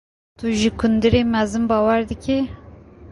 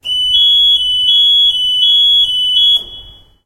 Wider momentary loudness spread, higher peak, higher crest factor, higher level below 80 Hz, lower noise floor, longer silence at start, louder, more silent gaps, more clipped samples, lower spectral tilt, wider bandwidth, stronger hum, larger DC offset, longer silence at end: first, 7 LU vs 3 LU; about the same, -4 dBFS vs -2 dBFS; first, 16 dB vs 10 dB; first, -38 dBFS vs -44 dBFS; first, -42 dBFS vs -36 dBFS; first, 0.4 s vs 0.05 s; second, -19 LUFS vs -7 LUFS; neither; neither; first, -6 dB/octave vs 0.5 dB/octave; second, 11 kHz vs 15 kHz; neither; neither; second, 0 s vs 0.35 s